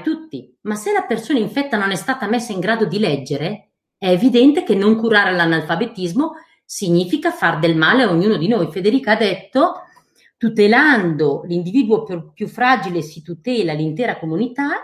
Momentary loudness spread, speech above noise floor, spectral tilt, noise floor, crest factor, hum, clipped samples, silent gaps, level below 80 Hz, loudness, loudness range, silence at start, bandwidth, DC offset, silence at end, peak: 12 LU; 37 dB; -5.5 dB/octave; -53 dBFS; 16 dB; none; under 0.1%; none; -62 dBFS; -17 LUFS; 4 LU; 0 s; 14.5 kHz; under 0.1%; 0 s; 0 dBFS